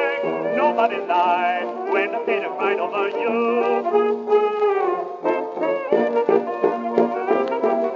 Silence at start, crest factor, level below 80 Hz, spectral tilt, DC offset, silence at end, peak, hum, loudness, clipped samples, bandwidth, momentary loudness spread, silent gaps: 0 s; 18 dB; -88 dBFS; -6.5 dB/octave; under 0.1%; 0 s; -4 dBFS; none; -21 LUFS; under 0.1%; 7 kHz; 5 LU; none